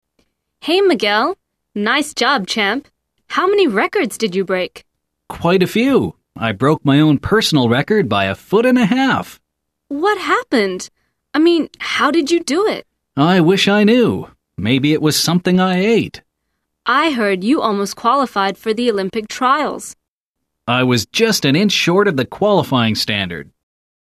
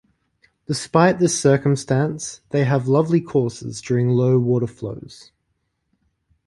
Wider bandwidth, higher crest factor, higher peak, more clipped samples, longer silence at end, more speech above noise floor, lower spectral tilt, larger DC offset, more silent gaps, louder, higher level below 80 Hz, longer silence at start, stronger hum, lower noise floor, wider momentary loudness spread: first, 14 kHz vs 11.5 kHz; about the same, 14 dB vs 18 dB; about the same, -2 dBFS vs -2 dBFS; neither; second, 0.6 s vs 1.3 s; first, 62 dB vs 53 dB; about the same, -5 dB/octave vs -6 dB/octave; neither; first, 20.08-20.35 s vs none; first, -15 LUFS vs -19 LUFS; first, -50 dBFS vs -56 dBFS; about the same, 0.65 s vs 0.7 s; neither; first, -77 dBFS vs -72 dBFS; about the same, 11 LU vs 13 LU